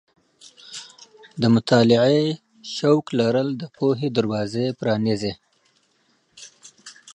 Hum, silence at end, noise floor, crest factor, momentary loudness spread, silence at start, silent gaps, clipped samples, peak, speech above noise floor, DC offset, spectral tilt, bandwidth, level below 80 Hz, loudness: none; 0.05 s; -65 dBFS; 18 dB; 23 LU; 0.65 s; none; under 0.1%; -4 dBFS; 45 dB; under 0.1%; -6.5 dB/octave; 10 kHz; -60 dBFS; -21 LUFS